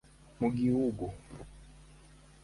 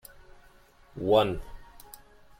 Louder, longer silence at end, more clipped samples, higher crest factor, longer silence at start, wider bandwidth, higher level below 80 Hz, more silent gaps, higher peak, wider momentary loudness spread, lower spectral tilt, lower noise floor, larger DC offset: second, -32 LUFS vs -27 LUFS; about the same, 0.5 s vs 0.45 s; neither; about the same, 18 dB vs 22 dB; second, 0.4 s vs 0.95 s; second, 11.5 kHz vs 16.5 kHz; about the same, -54 dBFS vs -50 dBFS; neither; second, -16 dBFS vs -10 dBFS; second, 21 LU vs 26 LU; first, -8.5 dB/octave vs -6 dB/octave; about the same, -57 dBFS vs -57 dBFS; neither